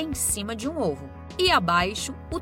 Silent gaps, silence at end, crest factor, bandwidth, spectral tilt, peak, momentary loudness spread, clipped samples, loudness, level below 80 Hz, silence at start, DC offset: none; 0 s; 18 dB; 16.5 kHz; -3 dB/octave; -8 dBFS; 11 LU; under 0.1%; -24 LUFS; -42 dBFS; 0 s; under 0.1%